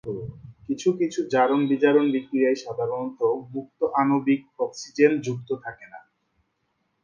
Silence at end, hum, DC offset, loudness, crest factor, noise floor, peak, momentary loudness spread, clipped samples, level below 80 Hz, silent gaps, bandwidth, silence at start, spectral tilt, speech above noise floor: 1.05 s; none; under 0.1%; -24 LUFS; 20 dB; -73 dBFS; -4 dBFS; 14 LU; under 0.1%; -64 dBFS; none; 7.4 kHz; 0.05 s; -6 dB/octave; 50 dB